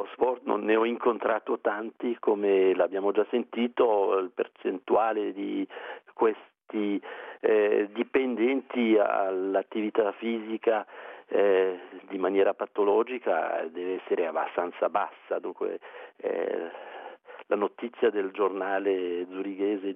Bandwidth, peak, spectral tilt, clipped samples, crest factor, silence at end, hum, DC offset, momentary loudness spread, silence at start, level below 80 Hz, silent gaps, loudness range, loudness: 3.8 kHz; -10 dBFS; -8 dB/octave; under 0.1%; 18 dB; 0 s; none; under 0.1%; 11 LU; 0 s; -78 dBFS; none; 5 LU; -28 LUFS